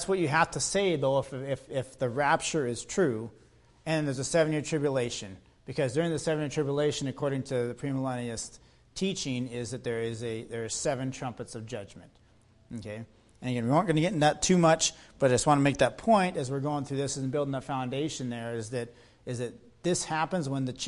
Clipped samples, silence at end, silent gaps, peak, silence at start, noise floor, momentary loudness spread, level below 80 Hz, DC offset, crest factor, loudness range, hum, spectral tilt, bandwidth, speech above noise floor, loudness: under 0.1%; 0 s; none; -10 dBFS; 0 s; -61 dBFS; 15 LU; -58 dBFS; under 0.1%; 18 dB; 8 LU; none; -4.5 dB/octave; 11.5 kHz; 32 dB; -29 LUFS